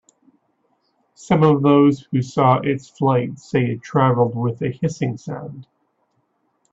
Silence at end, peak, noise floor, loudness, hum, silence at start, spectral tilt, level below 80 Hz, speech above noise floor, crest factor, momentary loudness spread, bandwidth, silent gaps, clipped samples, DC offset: 1.1 s; -2 dBFS; -67 dBFS; -19 LUFS; none; 1.2 s; -8 dB/octave; -58 dBFS; 49 dB; 18 dB; 11 LU; 8 kHz; none; under 0.1%; under 0.1%